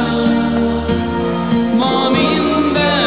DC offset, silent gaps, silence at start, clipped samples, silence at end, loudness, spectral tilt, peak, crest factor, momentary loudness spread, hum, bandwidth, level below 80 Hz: 0.8%; none; 0 s; under 0.1%; 0 s; -15 LUFS; -10 dB/octave; -2 dBFS; 12 dB; 4 LU; none; 4 kHz; -34 dBFS